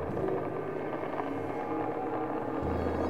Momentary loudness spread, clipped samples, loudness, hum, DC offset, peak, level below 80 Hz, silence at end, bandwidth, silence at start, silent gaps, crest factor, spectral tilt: 3 LU; under 0.1%; -34 LUFS; none; 0.4%; -16 dBFS; -50 dBFS; 0 s; 15.5 kHz; 0 s; none; 16 dB; -8.5 dB/octave